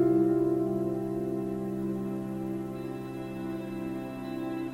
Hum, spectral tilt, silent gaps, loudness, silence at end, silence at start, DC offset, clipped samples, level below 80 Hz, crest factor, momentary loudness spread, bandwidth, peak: none; -8.5 dB/octave; none; -32 LUFS; 0 s; 0 s; under 0.1%; under 0.1%; -58 dBFS; 16 dB; 11 LU; 15.5 kHz; -16 dBFS